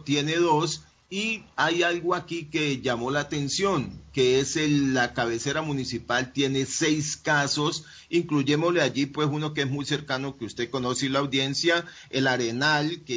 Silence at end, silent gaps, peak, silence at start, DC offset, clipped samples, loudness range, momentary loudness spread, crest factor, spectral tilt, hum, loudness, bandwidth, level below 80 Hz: 0 s; none; -8 dBFS; 0 s; under 0.1%; under 0.1%; 2 LU; 7 LU; 16 dB; -4 dB/octave; none; -25 LUFS; 7.8 kHz; -56 dBFS